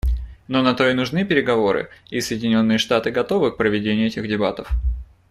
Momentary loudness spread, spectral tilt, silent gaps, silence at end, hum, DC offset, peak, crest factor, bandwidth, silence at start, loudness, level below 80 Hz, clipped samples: 8 LU; -5.5 dB/octave; none; 0.25 s; none; under 0.1%; -2 dBFS; 18 dB; 14 kHz; 0.05 s; -20 LUFS; -30 dBFS; under 0.1%